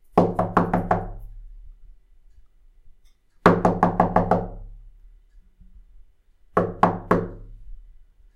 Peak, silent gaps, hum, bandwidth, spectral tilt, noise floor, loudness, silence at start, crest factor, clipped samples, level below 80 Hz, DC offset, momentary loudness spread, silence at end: 0 dBFS; none; none; 11 kHz; -8.5 dB/octave; -55 dBFS; -22 LUFS; 0.15 s; 24 dB; under 0.1%; -40 dBFS; under 0.1%; 18 LU; 0.6 s